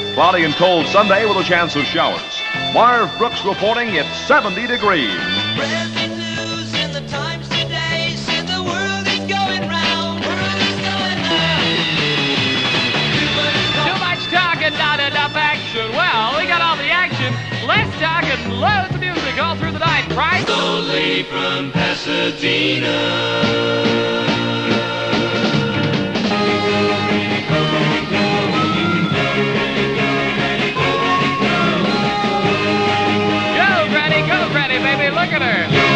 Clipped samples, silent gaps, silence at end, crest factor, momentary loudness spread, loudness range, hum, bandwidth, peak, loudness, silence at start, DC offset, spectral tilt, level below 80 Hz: under 0.1%; none; 0 s; 16 dB; 5 LU; 3 LU; none; 10 kHz; 0 dBFS; -16 LUFS; 0 s; under 0.1%; -4.5 dB/octave; -46 dBFS